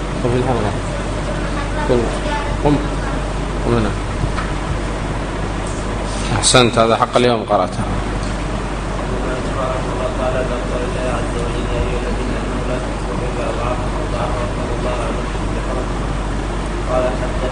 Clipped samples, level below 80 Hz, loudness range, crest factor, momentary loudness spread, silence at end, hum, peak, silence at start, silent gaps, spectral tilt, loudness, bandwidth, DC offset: under 0.1%; -24 dBFS; 5 LU; 18 dB; 8 LU; 0 s; none; 0 dBFS; 0 s; none; -5 dB/octave; -19 LUFS; 10 kHz; under 0.1%